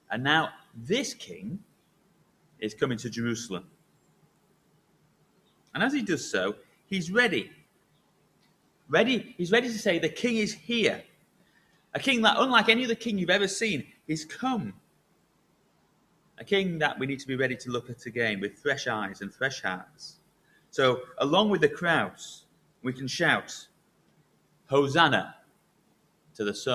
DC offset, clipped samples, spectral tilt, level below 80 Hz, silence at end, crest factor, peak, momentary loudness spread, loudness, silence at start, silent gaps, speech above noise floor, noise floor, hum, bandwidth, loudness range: under 0.1%; under 0.1%; -4 dB/octave; -68 dBFS; 0 s; 24 dB; -4 dBFS; 17 LU; -27 LUFS; 0.1 s; none; 40 dB; -67 dBFS; none; 14.5 kHz; 9 LU